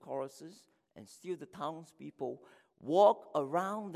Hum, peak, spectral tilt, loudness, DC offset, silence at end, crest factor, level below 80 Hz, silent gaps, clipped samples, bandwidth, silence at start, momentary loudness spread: none; -14 dBFS; -6 dB/octave; -34 LUFS; under 0.1%; 0 s; 22 dB; -84 dBFS; none; under 0.1%; 14 kHz; 0.05 s; 25 LU